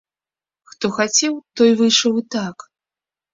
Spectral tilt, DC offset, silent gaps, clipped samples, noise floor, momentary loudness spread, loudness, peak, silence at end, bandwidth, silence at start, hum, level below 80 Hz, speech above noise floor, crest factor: -2.5 dB/octave; under 0.1%; none; under 0.1%; under -90 dBFS; 11 LU; -17 LUFS; -2 dBFS; 0.8 s; 7.8 kHz; 0.8 s; none; -64 dBFS; over 73 dB; 18 dB